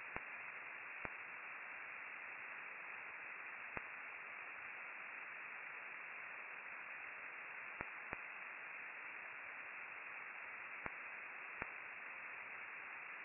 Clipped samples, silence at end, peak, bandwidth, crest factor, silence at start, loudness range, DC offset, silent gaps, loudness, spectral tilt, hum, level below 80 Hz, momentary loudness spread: under 0.1%; 0 s; -22 dBFS; 2.9 kHz; 28 dB; 0 s; 0 LU; under 0.1%; none; -49 LUFS; 3 dB/octave; none; -78 dBFS; 1 LU